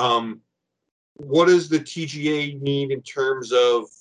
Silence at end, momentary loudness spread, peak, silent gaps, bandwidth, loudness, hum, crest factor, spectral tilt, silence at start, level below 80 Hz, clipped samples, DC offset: 0.15 s; 11 LU; -4 dBFS; 0.91-1.16 s; 10 kHz; -21 LUFS; none; 18 dB; -5 dB/octave; 0 s; -70 dBFS; under 0.1%; under 0.1%